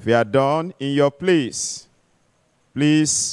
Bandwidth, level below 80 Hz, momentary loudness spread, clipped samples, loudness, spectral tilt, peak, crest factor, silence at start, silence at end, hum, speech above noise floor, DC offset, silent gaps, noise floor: 12 kHz; -60 dBFS; 10 LU; under 0.1%; -19 LUFS; -4.5 dB/octave; -4 dBFS; 16 dB; 0 s; 0 s; none; 44 dB; under 0.1%; none; -63 dBFS